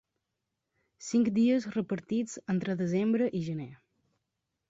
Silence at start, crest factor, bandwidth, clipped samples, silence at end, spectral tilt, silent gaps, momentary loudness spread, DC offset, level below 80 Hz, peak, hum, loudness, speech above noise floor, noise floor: 1 s; 14 dB; 8 kHz; under 0.1%; 0.95 s; -6.5 dB/octave; none; 11 LU; under 0.1%; -70 dBFS; -16 dBFS; none; -30 LUFS; 56 dB; -85 dBFS